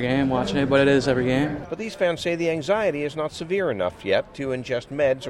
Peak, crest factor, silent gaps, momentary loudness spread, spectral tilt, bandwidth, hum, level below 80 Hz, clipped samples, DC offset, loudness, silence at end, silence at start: -6 dBFS; 16 dB; none; 10 LU; -6 dB/octave; 12.5 kHz; none; -48 dBFS; under 0.1%; under 0.1%; -23 LUFS; 0 s; 0 s